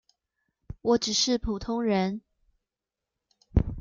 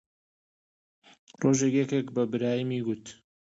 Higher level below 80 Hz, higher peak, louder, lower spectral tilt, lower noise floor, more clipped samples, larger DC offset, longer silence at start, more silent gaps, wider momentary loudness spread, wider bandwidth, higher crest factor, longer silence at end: first, -40 dBFS vs -70 dBFS; first, -8 dBFS vs -12 dBFS; about the same, -27 LUFS vs -28 LUFS; second, -4.5 dB/octave vs -6 dB/octave; about the same, -88 dBFS vs under -90 dBFS; neither; neither; second, 0.7 s vs 1.4 s; neither; about the same, 9 LU vs 10 LU; first, 9 kHz vs 8 kHz; about the same, 22 dB vs 18 dB; second, 0 s vs 0.3 s